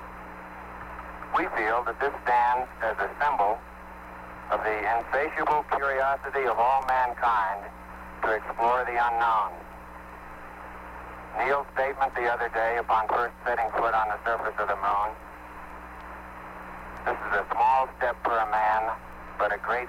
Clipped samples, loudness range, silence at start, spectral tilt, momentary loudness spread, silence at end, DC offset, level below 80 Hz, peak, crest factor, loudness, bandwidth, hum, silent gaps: under 0.1%; 4 LU; 0 s; -5 dB/octave; 18 LU; 0 s; under 0.1%; -50 dBFS; -12 dBFS; 14 dB; -26 LUFS; 16 kHz; none; none